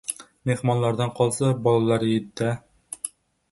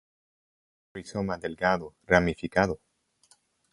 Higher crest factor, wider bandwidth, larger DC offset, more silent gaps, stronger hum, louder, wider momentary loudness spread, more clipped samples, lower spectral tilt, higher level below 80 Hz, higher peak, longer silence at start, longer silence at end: second, 18 dB vs 26 dB; about the same, 12 kHz vs 11.5 kHz; neither; neither; neither; first, -24 LUFS vs -27 LUFS; second, 12 LU vs 16 LU; neither; about the same, -6 dB/octave vs -6 dB/octave; second, -60 dBFS vs -50 dBFS; about the same, -6 dBFS vs -4 dBFS; second, 0.1 s vs 0.95 s; second, 0.45 s vs 0.95 s